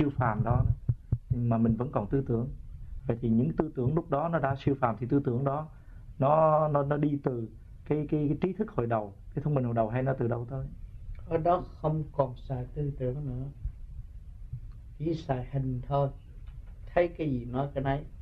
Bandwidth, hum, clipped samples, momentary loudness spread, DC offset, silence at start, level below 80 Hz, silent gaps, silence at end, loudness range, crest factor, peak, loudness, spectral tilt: 5.2 kHz; none; under 0.1%; 18 LU; under 0.1%; 0 s; -44 dBFS; none; 0 s; 7 LU; 22 dB; -8 dBFS; -30 LUFS; -10.5 dB/octave